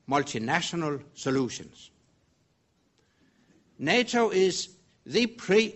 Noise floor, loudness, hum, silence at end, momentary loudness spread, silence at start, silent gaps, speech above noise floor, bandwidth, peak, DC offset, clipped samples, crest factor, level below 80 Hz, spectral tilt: -70 dBFS; -27 LUFS; none; 0 s; 10 LU; 0.1 s; none; 43 dB; 8.2 kHz; -8 dBFS; under 0.1%; under 0.1%; 20 dB; -66 dBFS; -4 dB/octave